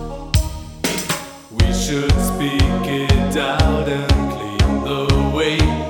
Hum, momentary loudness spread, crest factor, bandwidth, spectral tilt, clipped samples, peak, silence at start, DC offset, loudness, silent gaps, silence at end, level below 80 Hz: none; 6 LU; 16 dB; 19.5 kHz; -5 dB/octave; under 0.1%; 0 dBFS; 0 s; under 0.1%; -19 LUFS; none; 0 s; -22 dBFS